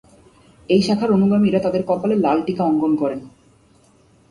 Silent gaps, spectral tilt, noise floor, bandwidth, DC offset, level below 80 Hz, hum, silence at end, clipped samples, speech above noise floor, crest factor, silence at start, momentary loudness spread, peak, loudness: none; -7.5 dB/octave; -54 dBFS; 11 kHz; under 0.1%; -54 dBFS; none; 1 s; under 0.1%; 36 dB; 16 dB; 0.7 s; 5 LU; -4 dBFS; -18 LUFS